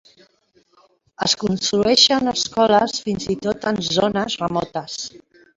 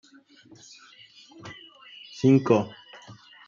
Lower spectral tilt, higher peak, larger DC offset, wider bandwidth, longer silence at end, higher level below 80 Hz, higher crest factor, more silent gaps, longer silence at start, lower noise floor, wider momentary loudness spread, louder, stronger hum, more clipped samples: second, -3.5 dB/octave vs -7.5 dB/octave; first, 0 dBFS vs -6 dBFS; neither; about the same, 8 kHz vs 7.4 kHz; about the same, 0.4 s vs 0.35 s; first, -52 dBFS vs -72 dBFS; about the same, 20 dB vs 22 dB; neither; second, 1.2 s vs 1.45 s; first, -60 dBFS vs -52 dBFS; second, 14 LU vs 27 LU; first, -19 LUFS vs -23 LUFS; neither; neither